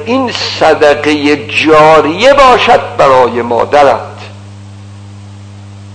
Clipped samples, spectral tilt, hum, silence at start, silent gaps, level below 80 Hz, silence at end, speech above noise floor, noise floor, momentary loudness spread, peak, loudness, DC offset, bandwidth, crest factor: 6%; -4.5 dB/octave; none; 0 s; none; -38 dBFS; 0 s; 22 dB; -29 dBFS; 9 LU; 0 dBFS; -7 LUFS; under 0.1%; 11 kHz; 8 dB